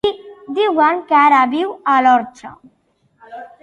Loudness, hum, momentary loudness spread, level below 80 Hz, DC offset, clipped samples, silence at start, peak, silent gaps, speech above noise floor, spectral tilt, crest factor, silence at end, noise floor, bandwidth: -14 LUFS; none; 21 LU; -58 dBFS; under 0.1%; under 0.1%; 0.05 s; -2 dBFS; none; 46 dB; -4.5 dB/octave; 14 dB; 0.15 s; -61 dBFS; 9.6 kHz